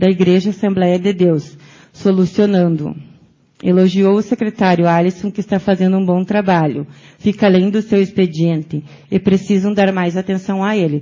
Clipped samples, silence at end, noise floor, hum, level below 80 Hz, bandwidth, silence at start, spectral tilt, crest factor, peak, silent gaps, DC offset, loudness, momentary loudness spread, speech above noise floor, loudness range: under 0.1%; 0 s; -47 dBFS; none; -52 dBFS; 7.4 kHz; 0 s; -8 dB/octave; 14 dB; 0 dBFS; none; under 0.1%; -15 LUFS; 8 LU; 33 dB; 1 LU